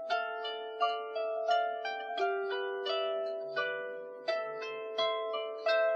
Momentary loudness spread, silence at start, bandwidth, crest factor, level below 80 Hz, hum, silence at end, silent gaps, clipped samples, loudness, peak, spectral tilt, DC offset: 7 LU; 0 s; 7 kHz; 16 dB; under -90 dBFS; none; 0 s; none; under 0.1%; -34 LUFS; -18 dBFS; -2.5 dB/octave; under 0.1%